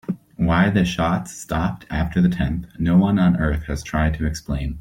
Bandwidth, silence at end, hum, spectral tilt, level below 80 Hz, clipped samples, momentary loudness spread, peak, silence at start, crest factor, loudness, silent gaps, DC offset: 13.5 kHz; 0 s; none; -7 dB/octave; -32 dBFS; under 0.1%; 9 LU; -4 dBFS; 0.1 s; 16 dB; -21 LUFS; none; under 0.1%